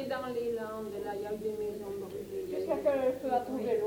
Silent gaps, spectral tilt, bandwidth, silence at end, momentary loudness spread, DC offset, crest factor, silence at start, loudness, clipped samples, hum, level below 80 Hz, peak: none; -6 dB/octave; over 20 kHz; 0 s; 9 LU; under 0.1%; 16 dB; 0 s; -34 LUFS; under 0.1%; none; -64 dBFS; -18 dBFS